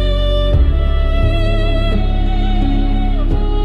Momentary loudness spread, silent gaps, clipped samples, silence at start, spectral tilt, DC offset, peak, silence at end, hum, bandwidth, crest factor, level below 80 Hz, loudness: 4 LU; none; under 0.1%; 0 s; -8 dB/octave; under 0.1%; -2 dBFS; 0 s; none; 4.9 kHz; 10 dB; -14 dBFS; -17 LUFS